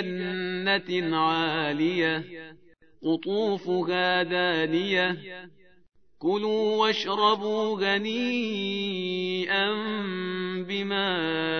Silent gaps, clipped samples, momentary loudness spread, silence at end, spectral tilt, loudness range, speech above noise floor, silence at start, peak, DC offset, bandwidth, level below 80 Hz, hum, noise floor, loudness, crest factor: none; under 0.1%; 7 LU; 0 s; -5.5 dB/octave; 2 LU; 31 dB; 0 s; -8 dBFS; 0.2%; 6.6 kHz; -72 dBFS; none; -57 dBFS; -26 LUFS; 18 dB